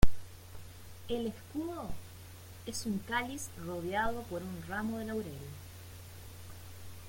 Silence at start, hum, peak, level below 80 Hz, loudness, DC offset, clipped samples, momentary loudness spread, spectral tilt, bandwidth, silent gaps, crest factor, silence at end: 0 s; none; -8 dBFS; -44 dBFS; -39 LUFS; under 0.1%; under 0.1%; 16 LU; -5 dB/octave; 17 kHz; none; 24 dB; 0 s